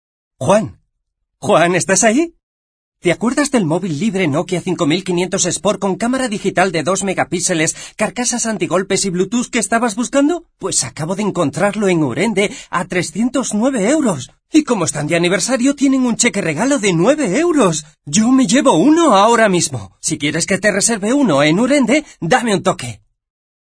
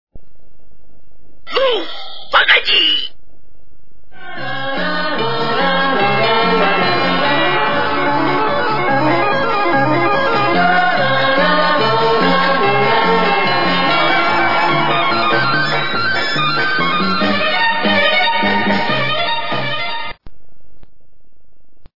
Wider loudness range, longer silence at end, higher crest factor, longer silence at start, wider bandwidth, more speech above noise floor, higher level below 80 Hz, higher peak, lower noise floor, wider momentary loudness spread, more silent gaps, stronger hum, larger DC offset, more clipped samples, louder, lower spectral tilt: about the same, 4 LU vs 4 LU; first, 0.65 s vs 0 s; about the same, 16 dB vs 16 dB; first, 0.4 s vs 0.05 s; first, 11 kHz vs 5.8 kHz; first, 58 dB vs 43 dB; about the same, -50 dBFS vs -50 dBFS; about the same, 0 dBFS vs 0 dBFS; first, -72 dBFS vs -57 dBFS; about the same, 7 LU vs 6 LU; first, 2.43-2.92 s vs none; neither; second, under 0.1% vs 8%; neither; about the same, -15 LUFS vs -14 LUFS; second, -4 dB/octave vs -5.5 dB/octave